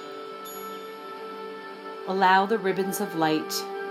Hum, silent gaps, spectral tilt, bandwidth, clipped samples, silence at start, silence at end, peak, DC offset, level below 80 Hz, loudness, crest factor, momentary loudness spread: none; none; -4 dB/octave; 16 kHz; under 0.1%; 0 s; 0 s; -8 dBFS; under 0.1%; -86 dBFS; -25 LUFS; 20 dB; 18 LU